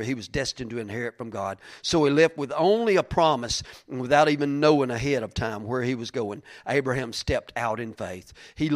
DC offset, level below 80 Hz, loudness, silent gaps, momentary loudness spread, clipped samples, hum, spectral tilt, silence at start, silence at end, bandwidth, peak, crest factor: under 0.1%; -48 dBFS; -25 LUFS; none; 13 LU; under 0.1%; none; -5 dB/octave; 0 s; 0 s; 15 kHz; -4 dBFS; 20 dB